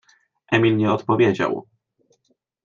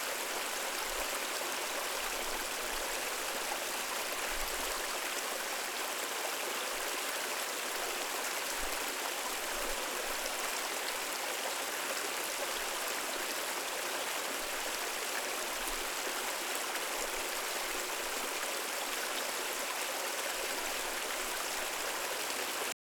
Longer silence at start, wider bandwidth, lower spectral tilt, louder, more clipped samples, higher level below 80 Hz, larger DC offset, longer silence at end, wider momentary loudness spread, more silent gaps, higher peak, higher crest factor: first, 0.5 s vs 0 s; second, 7.2 kHz vs over 20 kHz; first, -7.5 dB/octave vs 0.5 dB/octave; first, -20 LUFS vs -35 LUFS; neither; about the same, -62 dBFS vs -58 dBFS; neither; first, 1.05 s vs 0.15 s; first, 7 LU vs 1 LU; neither; first, -4 dBFS vs -20 dBFS; about the same, 18 dB vs 18 dB